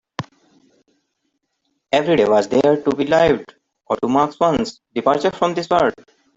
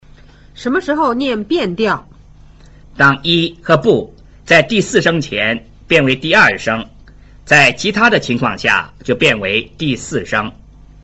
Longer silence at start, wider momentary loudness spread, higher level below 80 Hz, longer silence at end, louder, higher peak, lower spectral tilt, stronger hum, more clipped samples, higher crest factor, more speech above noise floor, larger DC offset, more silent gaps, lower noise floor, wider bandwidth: second, 0.2 s vs 0.55 s; about the same, 10 LU vs 10 LU; second, -50 dBFS vs -42 dBFS; about the same, 0.45 s vs 0.55 s; second, -18 LUFS vs -13 LUFS; about the same, -2 dBFS vs 0 dBFS; about the same, -5.5 dB/octave vs -4.5 dB/octave; second, none vs 50 Hz at -45 dBFS; neither; about the same, 16 dB vs 16 dB; first, 55 dB vs 27 dB; neither; neither; first, -72 dBFS vs -41 dBFS; about the same, 8 kHz vs 8.2 kHz